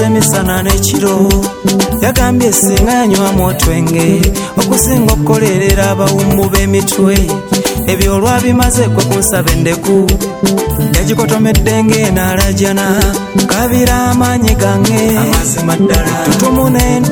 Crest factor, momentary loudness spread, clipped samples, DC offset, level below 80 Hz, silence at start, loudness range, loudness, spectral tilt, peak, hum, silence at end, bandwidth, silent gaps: 10 dB; 3 LU; 0.2%; under 0.1%; -20 dBFS; 0 s; 1 LU; -10 LUFS; -5 dB/octave; 0 dBFS; none; 0 s; over 20 kHz; none